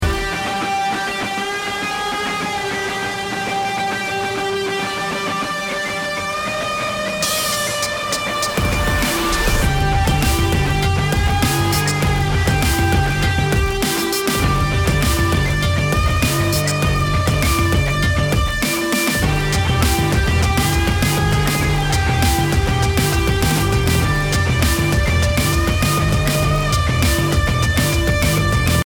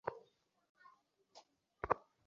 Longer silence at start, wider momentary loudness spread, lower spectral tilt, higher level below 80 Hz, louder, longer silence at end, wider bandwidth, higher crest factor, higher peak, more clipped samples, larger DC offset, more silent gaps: about the same, 0 s vs 0.05 s; second, 5 LU vs 26 LU; about the same, -4.5 dB/octave vs -4 dB/octave; first, -24 dBFS vs -68 dBFS; first, -17 LUFS vs -43 LUFS; second, 0 s vs 0.3 s; first, over 20 kHz vs 7.2 kHz; second, 16 dB vs 32 dB; first, -2 dBFS vs -16 dBFS; neither; neither; second, none vs 0.69-0.75 s